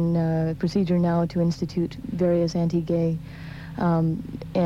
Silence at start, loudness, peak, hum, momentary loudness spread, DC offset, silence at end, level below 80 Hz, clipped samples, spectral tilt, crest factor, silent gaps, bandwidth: 0 s; -24 LUFS; -12 dBFS; none; 9 LU; under 0.1%; 0 s; -48 dBFS; under 0.1%; -8.5 dB/octave; 12 dB; none; 7.4 kHz